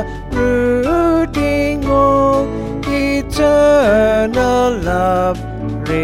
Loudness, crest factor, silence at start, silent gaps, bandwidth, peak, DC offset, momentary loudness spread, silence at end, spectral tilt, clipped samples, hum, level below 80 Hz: -14 LUFS; 12 dB; 0 s; none; 16 kHz; -2 dBFS; under 0.1%; 9 LU; 0 s; -6.5 dB/octave; under 0.1%; none; -28 dBFS